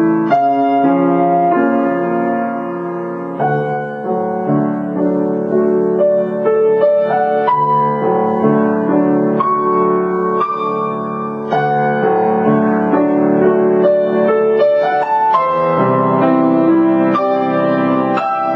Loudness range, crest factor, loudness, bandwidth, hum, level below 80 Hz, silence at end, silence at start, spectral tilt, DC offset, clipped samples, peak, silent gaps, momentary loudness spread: 4 LU; 12 dB; -14 LUFS; 5.8 kHz; none; -62 dBFS; 0 s; 0 s; -9.5 dB/octave; under 0.1%; under 0.1%; -2 dBFS; none; 6 LU